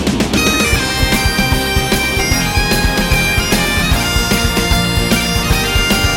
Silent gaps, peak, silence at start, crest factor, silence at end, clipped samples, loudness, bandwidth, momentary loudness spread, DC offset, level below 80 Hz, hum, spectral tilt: none; 0 dBFS; 0 s; 14 dB; 0 s; under 0.1%; -13 LUFS; 17 kHz; 1 LU; under 0.1%; -20 dBFS; none; -3.5 dB/octave